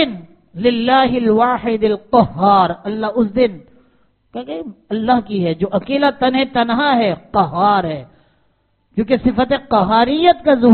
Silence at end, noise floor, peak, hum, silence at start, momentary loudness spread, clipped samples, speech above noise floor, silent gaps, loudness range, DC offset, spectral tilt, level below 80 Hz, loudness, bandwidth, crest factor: 0 s; -61 dBFS; 0 dBFS; none; 0 s; 13 LU; under 0.1%; 46 dB; none; 4 LU; under 0.1%; -4 dB/octave; -44 dBFS; -15 LUFS; 4.5 kHz; 16 dB